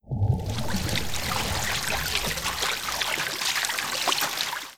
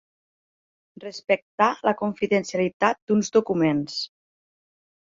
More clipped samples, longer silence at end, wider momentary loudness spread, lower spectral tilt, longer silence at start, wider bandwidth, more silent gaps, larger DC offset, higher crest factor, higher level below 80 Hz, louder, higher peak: neither; second, 0 s vs 1 s; second, 4 LU vs 13 LU; second, -2.5 dB/octave vs -5 dB/octave; second, 0.05 s vs 1 s; first, 18.5 kHz vs 7.8 kHz; second, none vs 1.42-1.58 s, 2.73-2.80 s, 3.02-3.07 s; neither; about the same, 22 dB vs 20 dB; first, -42 dBFS vs -66 dBFS; second, -26 LUFS vs -23 LUFS; about the same, -6 dBFS vs -6 dBFS